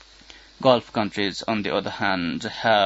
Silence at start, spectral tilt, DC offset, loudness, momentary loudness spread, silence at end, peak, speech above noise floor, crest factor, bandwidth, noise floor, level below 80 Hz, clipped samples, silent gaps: 0.35 s; -5 dB/octave; under 0.1%; -24 LUFS; 6 LU; 0 s; -2 dBFS; 26 dB; 22 dB; 8 kHz; -48 dBFS; -58 dBFS; under 0.1%; none